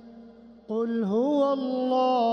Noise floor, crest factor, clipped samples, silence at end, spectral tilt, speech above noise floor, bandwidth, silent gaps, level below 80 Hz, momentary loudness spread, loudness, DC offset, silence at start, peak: -49 dBFS; 12 dB; under 0.1%; 0 s; -7.5 dB/octave; 25 dB; 6.6 kHz; none; -70 dBFS; 6 LU; -26 LUFS; under 0.1%; 0.05 s; -14 dBFS